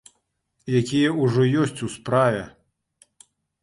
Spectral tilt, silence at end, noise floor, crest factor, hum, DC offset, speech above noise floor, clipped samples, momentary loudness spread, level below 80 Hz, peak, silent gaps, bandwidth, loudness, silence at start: -6.5 dB/octave; 1.15 s; -72 dBFS; 18 dB; none; under 0.1%; 51 dB; under 0.1%; 11 LU; -58 dBFS; -6 dBFS; none; 11.5 kHz; -22 LUFS; 0.65 s